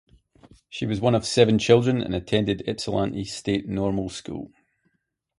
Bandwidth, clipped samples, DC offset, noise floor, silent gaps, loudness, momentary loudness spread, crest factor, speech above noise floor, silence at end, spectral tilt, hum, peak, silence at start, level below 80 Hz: 11.5 kHz; under 0.1%; under 0.1%; -74 dBFS; none; -23 LUFS; 15 LU; 22 dB; 51 dB; 0.95 s; -5.5 dB/octave; none; -4 dBFS; 0.7 s; -50 dBFS